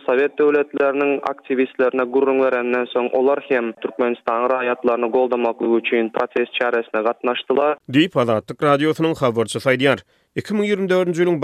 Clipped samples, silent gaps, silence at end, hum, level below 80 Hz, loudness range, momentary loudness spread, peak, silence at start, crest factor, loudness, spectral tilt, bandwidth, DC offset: under 0.1%; none; 0 s; none; -64 dBFS; 1 LU; 5 LU; -2 dBFS; 0.05 s; 16 dB; -19 LUFS; -6 dB/octave; 13.5 kHz; under 0.1%